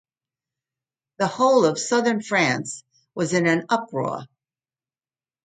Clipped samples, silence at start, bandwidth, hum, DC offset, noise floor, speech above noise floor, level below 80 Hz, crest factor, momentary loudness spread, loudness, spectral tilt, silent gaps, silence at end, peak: under 0.1%; 1.2 s; 9.6 kHz; none; under 0.1%; under -90 dBFS; over 69 dB; -70 dBFS; 18 dB; 15 LU; -21 LUFS; -4.5 dB/octave; none; 1.2 s; -6 dBFS